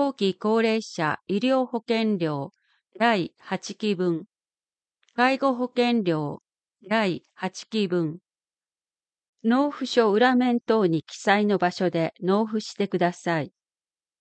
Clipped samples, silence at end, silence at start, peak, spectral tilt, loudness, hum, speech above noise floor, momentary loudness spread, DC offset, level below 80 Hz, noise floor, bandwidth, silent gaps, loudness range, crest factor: under 0.1%; 0.75 s; 0 s; -6 dBFS; -6 dB/octave; -24 LUFS; none; over 66 dB; 11 LU; under 0.1%; -76 dBFS; under -90 dBFS; 8.8 kHz; 9.28-9.33 s; 5 LU; 18 dB